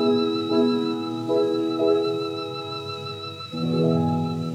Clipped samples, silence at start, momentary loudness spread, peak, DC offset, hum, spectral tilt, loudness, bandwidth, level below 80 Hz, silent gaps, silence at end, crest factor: under 0.1%; 0 s; 10 LU; -8 dBFS; under 0.1%; none; -7.5 dB/octave; -24 LUFS; 11 kHz; -74 dBFS; none; 0 s; 14 dB